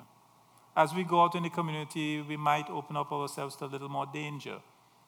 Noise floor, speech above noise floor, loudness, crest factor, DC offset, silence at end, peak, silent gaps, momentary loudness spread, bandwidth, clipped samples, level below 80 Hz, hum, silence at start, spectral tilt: -62 dBFS; 30 dB; -32 LUFS; 22 dB; under 0.1%; 0.45 s; -10 dBFS; none; 13 LU; over 20 kHz; under 0.1%; -88 dBFS; none; 0 s; -5.5 dB/octave